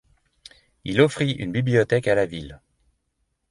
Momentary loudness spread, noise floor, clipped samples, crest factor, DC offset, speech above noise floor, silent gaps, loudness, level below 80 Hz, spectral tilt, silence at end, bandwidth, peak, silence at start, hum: 17 LU; -74 dBFS; under 0.1%; 20 dB; under 0.1%; 52 dB; none; -22 LUFS; -52 dBFS; -6.5 dB/octave; 0.95 s; 11.5 kHz; -4 dBFS; 0.85 s; none